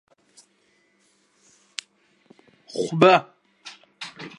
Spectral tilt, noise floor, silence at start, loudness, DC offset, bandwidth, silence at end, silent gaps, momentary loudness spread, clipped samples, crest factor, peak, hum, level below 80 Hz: -5.5 dB/octave; -65 dBFS; 2.75 s; -19 LUFS; under 0.1%; 11.5 kHz; 0.1 s; none; 27 LU; under 0.1%; 26 dB; -2 dBFS; none; -74 dBFS